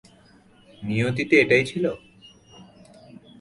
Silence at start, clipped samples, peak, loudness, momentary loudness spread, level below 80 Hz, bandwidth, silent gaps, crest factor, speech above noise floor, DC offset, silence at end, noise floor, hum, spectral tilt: 0.8 s; under 0.1%; -4 dBFS; -21 LUFS; 17 LU; -58 dBFS; 11.5 kHz; none; 20 dB; 33 dB; under 0.1%; 0.75 s; -54 dBFS; none; -6 dB/octave